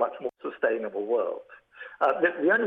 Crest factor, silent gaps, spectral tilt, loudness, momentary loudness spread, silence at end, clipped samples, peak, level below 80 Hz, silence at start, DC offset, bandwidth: 16 dB; none; -7 dB/octave; -27 LUFS; 16 LU; 0 s; under 0.1%; -10 dBFS; -78 dBFS; 0 s; under 0.1%; 4.7 kHz